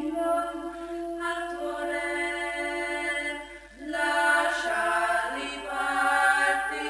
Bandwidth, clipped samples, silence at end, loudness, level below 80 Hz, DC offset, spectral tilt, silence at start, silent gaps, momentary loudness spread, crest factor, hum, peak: 11 kHz; under 0.1%; 0 s; -27 LUFS; -56 dBFS; under 0.1%; -1.5 dB/octave; 0 s; none; 12 LU; 18 dB; none; -10 dBFS